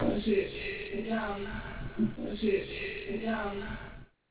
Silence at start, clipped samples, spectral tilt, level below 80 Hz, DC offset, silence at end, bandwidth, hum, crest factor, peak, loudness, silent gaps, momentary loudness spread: 0 s; under 0.1%; -4.5 dB/octave; -48 dBFS; under 0.1%; 0.25 s; 4 kHz; none; 16 dB; -18 dBFS; -34 LUFS; none; 10 LU